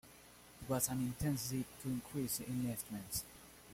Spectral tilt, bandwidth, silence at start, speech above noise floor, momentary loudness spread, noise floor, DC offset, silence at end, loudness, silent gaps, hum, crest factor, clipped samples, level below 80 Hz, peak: -4.5 dB/octave; 16.5 kHz; 0.05 s; 20 dB; 19 LU; -60 dBFS; under 0.1%; 0 s; -40 LUFS; none; none; 22 dB; under 0.1%; -62 dBFS; -20 dBFS